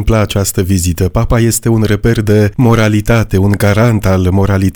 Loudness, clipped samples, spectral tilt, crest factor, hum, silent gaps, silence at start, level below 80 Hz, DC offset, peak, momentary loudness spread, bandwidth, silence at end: -11 LUFS; under 0.1%; -6 dB/octave; 10 dB; none; none; 0 s; -24 dBFS; 0.4%; 0 dBFS; 3 LU; over 20 kHz; 0 s